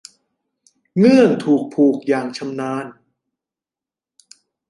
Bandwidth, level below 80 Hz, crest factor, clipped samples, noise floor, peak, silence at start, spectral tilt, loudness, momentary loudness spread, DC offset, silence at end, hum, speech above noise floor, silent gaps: 11.5 kHz; -66 dBFS; 18 dB; under 0.1%; -89 dBFS; -2 dBFS; 0.95 s; -7 dB/octave; -17 LUFS; 14 LU; under 0.1%; 1.8 s; none; 74 dB; none